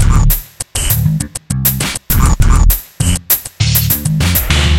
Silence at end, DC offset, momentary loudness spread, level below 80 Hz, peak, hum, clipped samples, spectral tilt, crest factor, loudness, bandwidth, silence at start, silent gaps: 0 s; under 0.1%; 6 LU; -16 dBFS; 0 dBFS; none; under 0.1%; -4 dB/octave; 12 dB; -13 LUFS; 17.5 kHz; 0 s; none